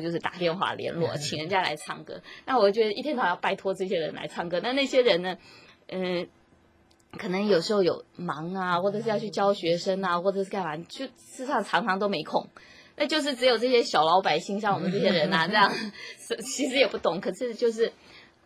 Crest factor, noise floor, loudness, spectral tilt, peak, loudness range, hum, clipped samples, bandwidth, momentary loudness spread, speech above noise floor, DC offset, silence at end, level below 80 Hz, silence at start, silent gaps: 20 dB; -61 dBFS; -26 LUFS; -4.5 dB/octave; -6 dBFS; 5 LU; none; under 0.1%; 15.5 kHz; 13 LU; 35 dB; under 0.1%; 0.25 s; -68 dBFS; 0 s; none